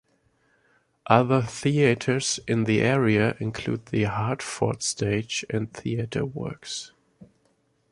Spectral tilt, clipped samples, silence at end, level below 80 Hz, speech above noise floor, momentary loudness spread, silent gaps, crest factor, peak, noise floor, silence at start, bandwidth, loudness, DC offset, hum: -5 dB/octave; under 0.1%; 0.65 s; -54 dBFS; 43 dB; 11 LU; none; 24 dB; -2 dBFS; -68 dBFS; 1.05 s; 11.5 kHz; -25 LUFS; under 0.1%; none